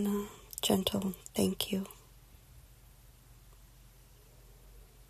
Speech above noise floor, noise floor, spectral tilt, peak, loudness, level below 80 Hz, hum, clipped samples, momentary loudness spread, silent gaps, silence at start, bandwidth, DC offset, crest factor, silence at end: 25 dB; -58 dBFS; -4.5 dB/octave; -14 dBFS; -34 LUFS; -58 dBFS; none; under 0.1%; 14 LU; none; 0 s; 14.5 kHz; under 0.1%; 24 dB; 0.05 s